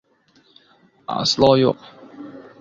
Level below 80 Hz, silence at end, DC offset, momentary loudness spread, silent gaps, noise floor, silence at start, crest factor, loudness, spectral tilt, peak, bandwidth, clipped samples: -52 dBFS; 0.2 s; under 0.1%; 24 LU; none; -58 dBFS; 1.1 s; 20 dB; -17 LUFS; -5 dB/octave; -2 dBFS; 7.8 kHz; under 0.1%